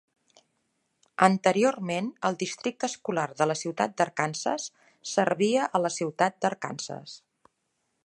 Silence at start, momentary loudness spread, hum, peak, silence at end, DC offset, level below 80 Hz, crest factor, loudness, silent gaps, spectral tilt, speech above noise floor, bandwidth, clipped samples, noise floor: 1.2 s; 14 LU; none; -2 dBFS; 0.85 s; under 0.1%; -78 dBFS; 26 dB; -27 LUFS; none; -4.5 dB/octave; 50 dB; 11.5 kHz; under 0.1%; -77 dBFS